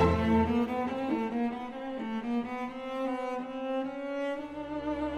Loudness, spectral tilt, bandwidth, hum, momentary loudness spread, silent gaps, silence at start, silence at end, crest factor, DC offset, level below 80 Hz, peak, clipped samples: -32 LUFS; -7.5 dB/octave; 10 kHz; none; 10 LU; none; 0 s; 0 s; 18 dB; under 0.1%; -48 dBFS; -14 dBFS; under 0.1%